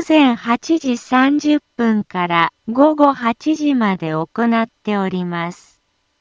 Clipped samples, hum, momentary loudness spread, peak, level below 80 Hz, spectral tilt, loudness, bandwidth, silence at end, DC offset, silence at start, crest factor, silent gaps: under 0.1%; none; 8 LU; 0 dBFS; -62 dBFS; -6 dB/octave; -17 LUFS; 7.6 kHz; 0.65 s; under 0.1%; 0 s; 16 dB; none